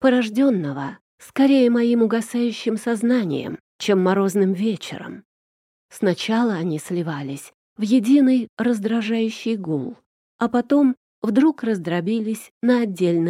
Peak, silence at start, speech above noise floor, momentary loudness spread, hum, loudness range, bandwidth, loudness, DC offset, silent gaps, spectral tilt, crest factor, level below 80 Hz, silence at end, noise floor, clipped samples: -6 dBFS; 0 s; over 70 dB; 12 LU; none; 3 LU; 14.5 kHz; -21 LUFS; under 0.1%; 1.01-1.18 s, 3.60-3.79 s, 5.25-5.89 s, 7.54-7.76 s, 8.49-8.57 s, 10.06-10.39 s, 10.97-11.22 s, 12.51-12.61 s; -6.5 dB/octave; 14 dB; -70 dBFS; 0 s; under -90 dBFS; under 0.1%